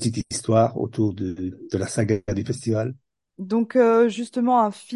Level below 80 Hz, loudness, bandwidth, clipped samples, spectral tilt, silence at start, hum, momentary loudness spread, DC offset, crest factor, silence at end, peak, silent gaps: -50 dBFS; -23 LUFS; 11.5 kHz; under 0.1%; -6.5 dB/octave; 0 s; none; 11 LU; under 0.1%; 16 dB; 0 s; -6 dBFS; none